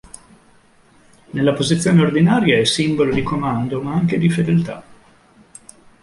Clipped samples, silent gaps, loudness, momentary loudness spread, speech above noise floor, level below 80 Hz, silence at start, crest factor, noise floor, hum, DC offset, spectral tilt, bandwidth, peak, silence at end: under 0.1%; none; -17 LUFS; 7 LU; 35 dB; -48 dBFS; 1.35 s; 16 dB; -52 dBFS; none; under 0.1%; -6 dB/octave; 11.5 kHz; -2 dBFS; 1.1 s